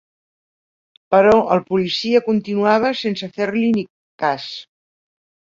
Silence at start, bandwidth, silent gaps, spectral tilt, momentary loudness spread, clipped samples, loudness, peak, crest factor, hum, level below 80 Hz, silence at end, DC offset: 1.1 s; 7.6 kHz; 3.90-4.18 s; -6 dB/octave; 11 LU; under 0.1%; -18 LUFS; -2 dBFS; 18 dB; none; -56 dBFS; 1 s; under 0.1%